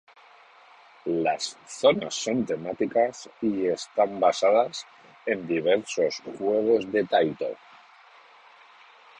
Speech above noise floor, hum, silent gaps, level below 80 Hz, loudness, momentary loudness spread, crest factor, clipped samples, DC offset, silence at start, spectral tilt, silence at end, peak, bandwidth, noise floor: 28 dB; none; none; -68 dBFS; -26 LUFS; 11 LU; 20 dB; under 0.1%; under 0.1%; 1.05 s; -4 dB/octave; 1.65 s; -8 dBFS; 10.5 kHz; -53 dBFS